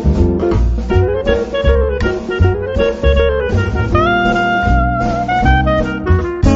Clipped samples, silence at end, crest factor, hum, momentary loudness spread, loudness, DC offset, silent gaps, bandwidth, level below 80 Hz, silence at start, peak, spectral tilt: under 0.1%; 0 s; 12 dB; none; 4 LU; -14 LUFS; under 0.1%; none; 7.8 kHz; -18 dBFS; 0 s; 0 dBFS; -6 dB/octave